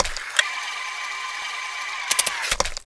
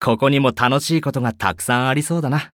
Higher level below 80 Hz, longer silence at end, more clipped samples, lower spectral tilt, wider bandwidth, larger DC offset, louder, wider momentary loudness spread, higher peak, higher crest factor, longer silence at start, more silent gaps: first, -40 dBFS vs -52 dBFS; about the same, 0 s vs 0.05 s; neither; second, 1 dB/octave vs -5 dB/octave; second, 11 kHz vs 17.5 kHz; neither; second, -24 LUFS vs -18 LUFS; first, 8 LU vs 5 LU; about the same, 0 dBFS vs -2 dBFS; first, 26 dB vs 16 dB; about the same, 0 s vs 0 s; neither